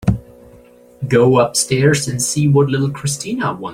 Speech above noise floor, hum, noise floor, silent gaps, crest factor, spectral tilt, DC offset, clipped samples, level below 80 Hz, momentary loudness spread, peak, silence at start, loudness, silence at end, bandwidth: 29 dB; none; -44 dBFS; none; 16 dB; -5 dB/octave; under 0.1%; under 0.1%; -40 dBFS; 9 LU; 0 dBFS; 0 s; -16 LUFS; 0 s; 16 kHz